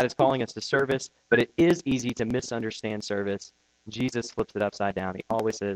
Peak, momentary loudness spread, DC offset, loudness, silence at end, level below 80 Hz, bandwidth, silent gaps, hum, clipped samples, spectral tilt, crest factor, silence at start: -8 dBFS; 10 LU; under 0.1%; -27 LUFS; 0 s; -56 dBFS; 13.5 kHz; none; none; under 0.1%; -5 dB/octave; 20 dB; 0 s